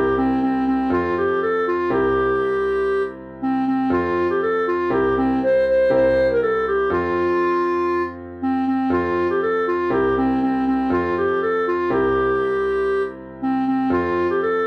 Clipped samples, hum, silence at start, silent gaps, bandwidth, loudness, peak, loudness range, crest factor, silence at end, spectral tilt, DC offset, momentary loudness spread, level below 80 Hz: under 0.1%; none; 0 s; none; 6.2 kHz; -20 LUFS; -8 dBFS; 2 LU; 12 dB; 0 s; -8 dB/octave; under 0.1%; 4 LU; -44 dBFS